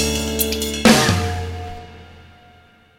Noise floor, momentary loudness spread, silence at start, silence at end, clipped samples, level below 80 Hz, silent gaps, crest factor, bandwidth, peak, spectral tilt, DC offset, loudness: -50 dBFS; 19 LU; 0 s; 0.8 s; under 0.1%; -34 dBFS; none; 20 dB; 17.5 kHz; 0 dBFS; -4 dB/octave; under 0.1%; -17 LUFS